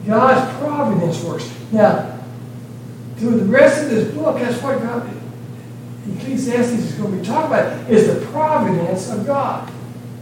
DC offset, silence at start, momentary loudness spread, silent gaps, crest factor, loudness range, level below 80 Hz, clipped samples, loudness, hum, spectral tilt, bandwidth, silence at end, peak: under 0.1%; 0 s; 19 LU; none; 18 dB; 4 LU; -58 dBFS; under 0.1%; -17 LUFS; none; -6.5 dB/octave; 17 kHz; 0 s; 0 dBFS